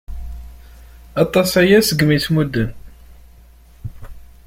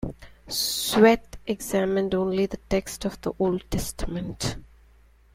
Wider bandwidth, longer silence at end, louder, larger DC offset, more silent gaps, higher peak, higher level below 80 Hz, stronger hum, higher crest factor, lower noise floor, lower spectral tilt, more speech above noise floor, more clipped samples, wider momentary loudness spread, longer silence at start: about the same, 16.5 kHz vs 16.5 kHz; second, 0.2 s vs 0.7 s; first, -16 LUFS vs -25 LUFS; neither; neither; about the same, -2 dBFS vs -4 dBFS; first, -36 dBFS vs -42 dBFS; neither; about the same, 18 dB vs 22 dB; second, -45 dBFS vs -56 dBFS; about the same, -5 dB/octave vs -4.5 dB/octave; about the same, 30 dB vs 31 dB; neither; first, 23 LU vs 14 LU; about the same, 0.1 s vs 0 s